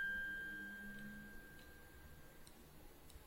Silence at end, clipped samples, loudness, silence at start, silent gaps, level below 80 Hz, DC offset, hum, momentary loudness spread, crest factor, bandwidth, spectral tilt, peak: 0 s; under 0.1%; -50 LUFS; 0 s; none; -62 dBFS; under 0.1%; none; 17 LU; 14 dB; 16 kHz; -3.5 dB/octave; -36 dBFS